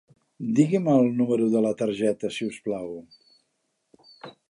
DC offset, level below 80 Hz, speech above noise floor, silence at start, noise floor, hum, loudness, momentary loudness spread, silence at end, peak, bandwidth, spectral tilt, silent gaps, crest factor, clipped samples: under 0.1%; -70 dBFS; 52 dB; 0.4 s; -75 dBFS; none; -24 LUFS; 20 LU; 0.2 s; -8 dBFS; 11 kHz; -7 dB/octave; none; 18 dB; under 0.1%